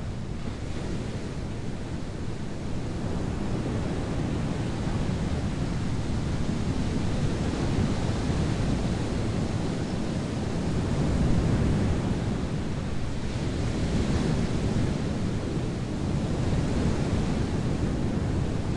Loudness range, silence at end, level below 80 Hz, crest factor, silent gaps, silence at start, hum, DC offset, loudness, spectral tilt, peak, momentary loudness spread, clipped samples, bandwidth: 4 LU; 0 s; -36 dBFS; 16 dB; none; 0 s; none; under 0.1%; -29 LUFS; -7 dB/octave; -12 dBFS; 8 LU; under 0.1%; 11.5 kHz